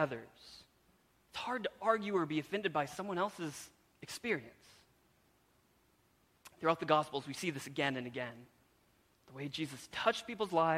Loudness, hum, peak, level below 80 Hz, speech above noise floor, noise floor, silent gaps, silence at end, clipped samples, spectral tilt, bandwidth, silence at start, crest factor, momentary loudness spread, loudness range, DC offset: -37 LUFS; none; -14 dBFS; -76 dBFS; 35 dB; -72 dBFS; none; 0 s; under 0.1%; -4.5 dB/octave; 16.5 kHz; 0 s; 26 dB; 22 LU; 5 LU; under 0.1%